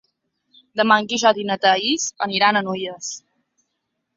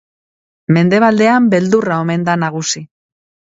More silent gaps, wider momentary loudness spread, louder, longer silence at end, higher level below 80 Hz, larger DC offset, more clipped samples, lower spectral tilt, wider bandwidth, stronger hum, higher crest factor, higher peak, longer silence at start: neither; first, 13 LU vs 9 LU; second, -19 LUFS vs -13 LUFS; first, 1 s vs 0.6 s; second, -68 dBFS vs -58 dBFS; neither; neither; second, -2.5 dB/octave vs -5.5 dB/octave; about the same, 7.8 kHz vs 8 kHz; neither; first, 20 dB vs 14 dB; about the same, -2 dBFS vs 0 dBFS; about the same, 0.75 s vs 0.7 s